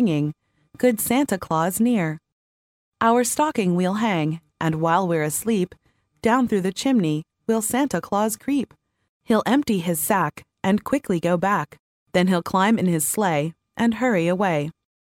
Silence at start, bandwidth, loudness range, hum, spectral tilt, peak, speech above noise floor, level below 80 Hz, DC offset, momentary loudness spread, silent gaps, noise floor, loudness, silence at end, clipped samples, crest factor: 0 s; 17 kHz; 1 LU; none; -5 dB/octave; -6 dBFS; over 69 dB; -58 dBFS; under 0.1%; 7 LU; 2.32-2.92 s, 9.09-9.20 s, 11.79-12.06 s; under -90 dBFS; -22 LUFS; 0.45 s; under 0.1%; 16 dB